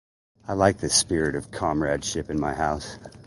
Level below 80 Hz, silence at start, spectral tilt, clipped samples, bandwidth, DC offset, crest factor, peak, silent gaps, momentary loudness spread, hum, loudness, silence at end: -44 dBFS; 0.45 s; -3.5 dB/octave; under 0.1%; 11.5 kHz; under 0.1%; 22 dB; -4 dBFS; none; 11 LU; none; -24 LUFS; 0.05 s